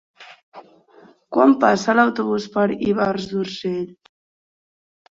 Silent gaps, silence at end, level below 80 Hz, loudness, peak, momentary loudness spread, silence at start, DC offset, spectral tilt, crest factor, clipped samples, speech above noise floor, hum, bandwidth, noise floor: 0.43-0.52 s; 1.2 s; -60 dBFS; -19 LUFS; -2 dBFS; 11 LU; 0.2 s; under 0.1%; -6 dB/octave; 20 dB; under 0.1%; 32 dB; none; 7.6 kHz; -51 dBFS